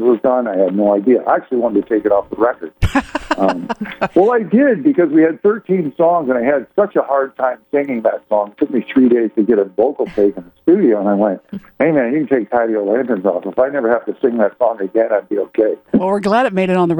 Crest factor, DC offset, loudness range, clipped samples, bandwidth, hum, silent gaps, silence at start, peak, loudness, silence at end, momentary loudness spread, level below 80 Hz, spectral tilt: 12 dB; under 0.1%; 2 LU; under 0.1%; over 20 kHz; none; none; 0 s; -2 dBFS; -15 LUFS; 0 s; 6 LU; -38 dBFS; -8 dB/octave